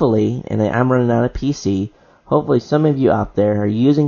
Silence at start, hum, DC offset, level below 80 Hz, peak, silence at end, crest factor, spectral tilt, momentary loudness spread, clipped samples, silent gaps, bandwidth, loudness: 0 s; none; under 0.1%; -40 dBFS; -2 dBFS; 0 s; 14 dB; -8 dB/octave; 5 LU; under 0.1%; none; 7.2 kHz; -17 LUFS